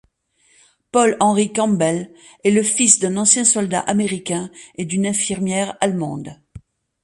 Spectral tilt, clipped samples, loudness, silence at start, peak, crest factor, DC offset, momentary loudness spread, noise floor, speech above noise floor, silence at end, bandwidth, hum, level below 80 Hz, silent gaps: -3.5 dB/octave; under 0.1%; -17 LUFS; 0.95 s; 0 dBFS; 20 dB; under 0.1%; 14 LU; -60 dBFS; 42 dB; 0.45 s; 11.5 kHz; none; -56 dBFS; none